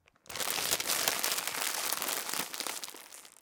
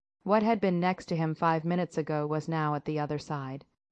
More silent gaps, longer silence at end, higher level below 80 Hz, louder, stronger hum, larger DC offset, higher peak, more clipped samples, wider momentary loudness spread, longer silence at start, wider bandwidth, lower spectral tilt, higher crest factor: neither; second, 0.1 s vs 0.3 s; about the same, -72 dBFS vs -68 dBFS; about the same, -31 LUFS vs -30 LUFS; neither; neither; first, -8 dBFS vs -12 dBFS; neither; first, 15 LU vs 9 LU; about the same, 0.3 s vs 0.25 s; first, 19 kHz vs 8.8 kHz; second, 0.5 dB/octave vs -7.5 dB/octave; first, 28 dB vs 18 dB